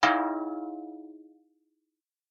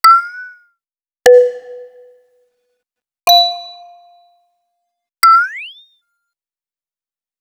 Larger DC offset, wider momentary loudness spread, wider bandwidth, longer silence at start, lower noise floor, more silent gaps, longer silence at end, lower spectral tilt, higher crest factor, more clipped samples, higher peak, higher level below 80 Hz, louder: neither; about the same, 22 LU vs 23 LU; second, 8.2 kHz vs over 20 kHz; about the same, 0 s vs 0.05 s; second, -85 dBFS vs under -90 dBFS; neither; second, 1.1 s vs 1.7 s; first, -3 dB/octave vs 1 dB/octave; first, 22 dB vs 16 dB; neither; second, -10 dBFS vs 0 dBFS; second, -74 dBFS vs -62 dBFS; second, -31 LUFS vs -11 LUFS